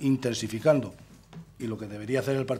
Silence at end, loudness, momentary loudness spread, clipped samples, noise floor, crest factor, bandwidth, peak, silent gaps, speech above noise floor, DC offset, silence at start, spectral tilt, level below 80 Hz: 0 s; -28 LUFS; 23 LU; under 0.1%; -48 dBFS; 20 dB; 15 kHz; -8 dBFS; none; 20 dB; under 0.1%; 0 s; -6 dB/octave; -60 dBFS